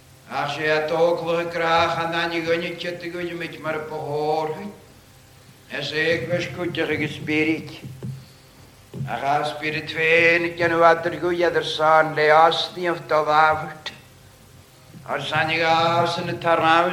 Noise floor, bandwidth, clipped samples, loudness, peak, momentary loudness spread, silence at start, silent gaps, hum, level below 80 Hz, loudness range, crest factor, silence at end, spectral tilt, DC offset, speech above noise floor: -49 dBFS; 16 kHz; under 0.1%; -21 LUFS; -2 dBFS; 14 LU; 0.25 s; none; none; -58 dBFS; 8 LU; 20 dB; 0 s; -5 dB/octave; under 0.1%; 28 dB